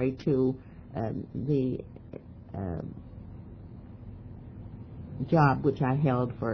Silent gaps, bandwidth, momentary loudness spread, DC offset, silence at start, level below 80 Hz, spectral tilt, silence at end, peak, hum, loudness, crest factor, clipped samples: none; 5.4 kHz; 21 LU; under 0.1%; 0 s; -52 dBFS; -10 dB/octave; 0 s; -10 dBFS; none; -29 LUFS; 20 dB; under 0.1%